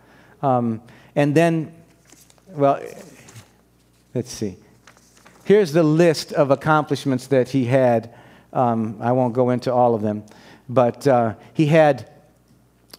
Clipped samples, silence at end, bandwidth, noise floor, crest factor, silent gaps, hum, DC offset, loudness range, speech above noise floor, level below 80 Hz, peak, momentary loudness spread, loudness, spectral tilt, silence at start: under 0.1%; 0.95 s; 16 kHz; -57 dBFS; 20 dB; none; none; under 0.1%; 9 LU; 39 dB; -64 dBFS; 0 dBFS; 13 LU; -19 LUFS; -7 dB/octave; 0.4 s